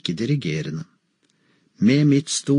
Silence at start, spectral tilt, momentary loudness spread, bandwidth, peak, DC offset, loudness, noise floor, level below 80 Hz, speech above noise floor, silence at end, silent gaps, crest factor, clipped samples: 0.05 s; -5.5 dB/octave; 13 LU; 10.5 kHz; -6 dBFS; under 0.1%; -21 LUFS; -66 dBFS; -64 dBFS; 46 dB; 0 s; none; 16 dB; under 0.1%